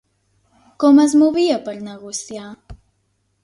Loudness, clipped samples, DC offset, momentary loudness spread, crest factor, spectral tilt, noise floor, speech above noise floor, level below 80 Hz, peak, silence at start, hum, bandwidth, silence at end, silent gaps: -16 LUFS; under 0.1%; under 0.1%; 21 LU; 16 dB; -4 dB/octave; -67 dBFS; 51 dB; -52 dBFS; -4 dBFS; 0.8 s; 50 Hz at -55 dBFS; 11.5 kHz; 0.7 s; none